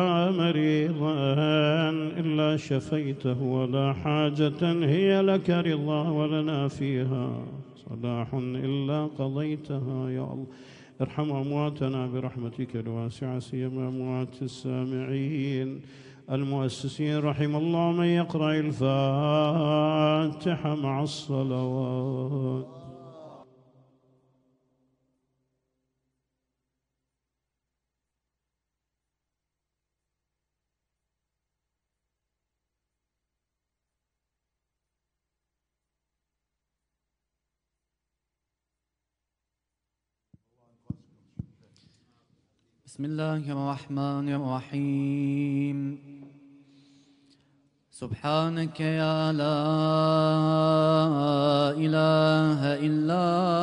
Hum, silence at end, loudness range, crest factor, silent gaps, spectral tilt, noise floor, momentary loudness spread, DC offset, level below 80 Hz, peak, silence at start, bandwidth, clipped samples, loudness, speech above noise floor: 60 Hz at -65 dBFS; 0 s; 10 LU; 18 dB; none; -7.5 dB/octave; -86 dBFS; 12 LU; under 0.1%; -66 dBFS; -10 dBFS; 0 s; 10.5 kHz; under 0.1%; -27 LUFS; 60 dB